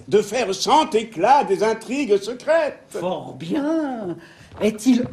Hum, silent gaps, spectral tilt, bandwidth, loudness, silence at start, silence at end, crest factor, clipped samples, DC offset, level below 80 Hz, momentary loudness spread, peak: none; none; -4.5 dB/octave; 14 kHz; -21 LUFS; 0.05 s; 0 s; 16 dB; under 0.1%; under 0.1%; -60 dBFS; 11 LU; -4 dBFS